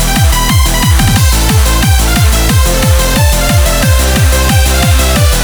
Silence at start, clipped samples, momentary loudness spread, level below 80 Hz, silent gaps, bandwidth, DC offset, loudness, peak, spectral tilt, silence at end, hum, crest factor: 0 s; under 0.1%; 1 LU; -10 dBFS; none; over 20 kHz; under 0.1%; -9 LUFS; 0 dBFS; -4 dB/octave; 0 s; none; 8 dB